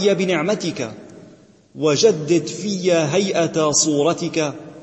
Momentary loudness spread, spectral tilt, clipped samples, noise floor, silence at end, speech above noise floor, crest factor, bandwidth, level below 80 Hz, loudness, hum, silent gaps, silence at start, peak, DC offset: 10 LU; -4 dB/octave; under 0.1%; -48 dBFS; 0 s; 29 dB; 18 dB; 8.6 kHz; -62 dBFS; -19 LUFS; none; none; 0 s; -2 dBFS; under 0.1%